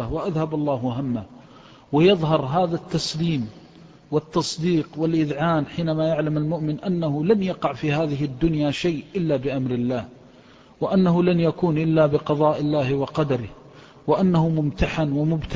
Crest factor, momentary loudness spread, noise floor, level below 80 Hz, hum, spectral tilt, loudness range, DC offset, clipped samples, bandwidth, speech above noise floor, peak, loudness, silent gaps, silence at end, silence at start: 16 dB; 7 LU; -50 dBFS; -44 dBFS; none; -7 dB/octave; 3 LU; under 0.1%; under 0.1%; 8 kHz; 28 dB; -6 dBFS; -22 LUFS; none; 0 s; 0 s